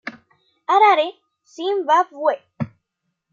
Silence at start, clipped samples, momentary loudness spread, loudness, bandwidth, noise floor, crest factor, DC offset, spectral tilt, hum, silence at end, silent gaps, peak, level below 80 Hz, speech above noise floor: 0.05 s; under 0.1%; 17 LU; -18 LUFS; 7.4 kHz; -77 dBFS; 18 dB; under 0.1%; -5 dB/octave; none; 0.65 s; none; -2 dBFS; -70 dBFS; 59 dB